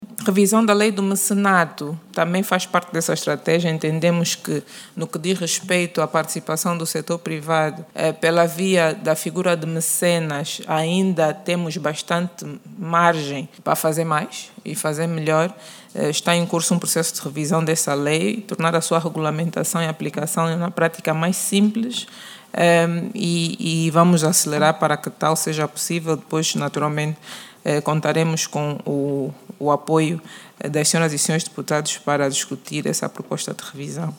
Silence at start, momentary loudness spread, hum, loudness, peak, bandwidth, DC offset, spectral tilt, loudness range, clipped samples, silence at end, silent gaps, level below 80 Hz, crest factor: 0 s; 10 LU; none; -20 LUFS; 0 dBFS; 19.5 kHz; under 0.1%; -4.5 dB/octave; 3 LU; under 0.1%; 0 s; none; -70 dBFS; 20 dB